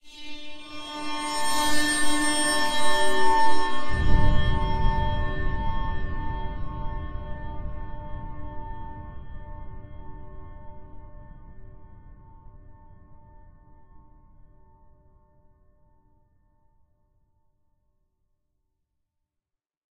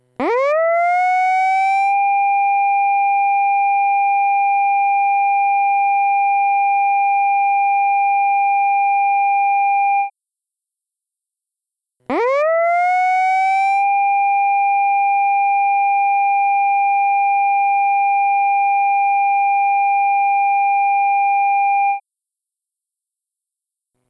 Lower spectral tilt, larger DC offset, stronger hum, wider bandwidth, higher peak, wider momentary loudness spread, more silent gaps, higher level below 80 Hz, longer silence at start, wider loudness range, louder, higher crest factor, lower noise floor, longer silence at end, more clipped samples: about the same, -3.5 dB/octave vs -3.5 dB/octave; neither; neither; first, 14.5 kHz vs 7.4 kHz; first, -6 dBFS vs -10 dBFS; first, 23 LU vs 0 LU; neither; first, -34 dBFS vs -72 dBFS; second, 0.05 s vs 0.2 s; first, 23 LU vs 4 LU; second, -27 LUFS vs -15 LUFS; first, 18 dB vs 6 dB; about the same, -86 dBFS vs -84 dBFS; first, 7.25 s vs 2.1 s; neither